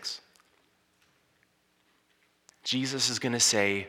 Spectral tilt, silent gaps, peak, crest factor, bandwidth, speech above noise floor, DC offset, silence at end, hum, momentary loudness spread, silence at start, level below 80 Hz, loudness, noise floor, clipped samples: -2 dB/octave; none; -10 dBFS; 22 dB; 17.5 kHz; 42 dB; under 0.1%; 0 s; none; 15 LU; 0 s; -80 dBFS; -26 LUFS; -70 dBFS; under 0.1%